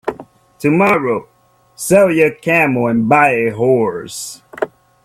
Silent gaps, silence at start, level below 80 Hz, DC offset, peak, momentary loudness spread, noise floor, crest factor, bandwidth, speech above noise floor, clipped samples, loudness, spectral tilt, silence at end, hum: none; 0.05 s; -54 dBFS; under 0.1%; 0 dBFS; 14 LU; -36 dBFS; 14 dB; 16 kHz; 22 dB; under 0.1%; -14 LUFS; -5.5 dB/octave; 0.4 s; none